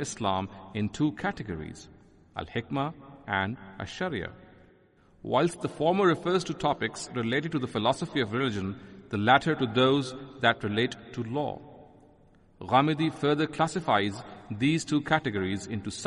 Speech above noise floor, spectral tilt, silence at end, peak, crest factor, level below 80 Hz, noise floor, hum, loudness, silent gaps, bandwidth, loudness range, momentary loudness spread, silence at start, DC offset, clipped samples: 32 dB; -5.5 dB/octave; 0 s; -8 dBFS; 22 dB; -60 dBFS; -60 dBFS; none; -28 LUFS; none; 11.5 kHz; 7 LU; 15 LU; 0 s; under 0.1%; under 0.1%